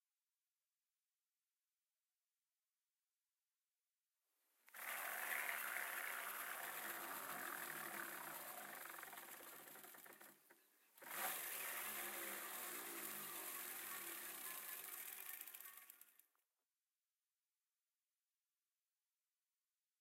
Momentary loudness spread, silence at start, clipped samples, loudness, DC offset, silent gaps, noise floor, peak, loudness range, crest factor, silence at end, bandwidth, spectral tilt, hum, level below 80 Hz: 13 LU; 4.65 s; under 0.1%; -48 LUFS; under 0.1%; none; under -90 dBFS; -30 dBFS; 8 LU; 24 dB; 3.85 s; 16.5 kHz; 0 dB/octave; none; under -90 dBFS